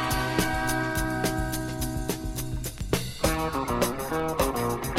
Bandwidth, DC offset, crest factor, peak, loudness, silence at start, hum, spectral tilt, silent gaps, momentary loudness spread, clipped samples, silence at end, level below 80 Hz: 16.5 kHz; under 0.1%; 18 dB; -10 dBFS; -28 LUFS; 0 s; none; -4.5 dB/octave; none; 6 LU; under 0.1%; 0 s; -36 dBFS